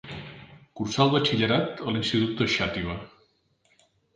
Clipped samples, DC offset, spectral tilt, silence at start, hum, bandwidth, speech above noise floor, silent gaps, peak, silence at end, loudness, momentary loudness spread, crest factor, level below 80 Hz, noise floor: under 0.1%; under 0.1%; -5.5 dB/octave; 0.05 s; none; 9.6 kHz; 42 dB; none; -6 dBFS; 1.1 s; -25 LUFS; 17 LU; 22 dB; -52 dBFS; -67 dBFS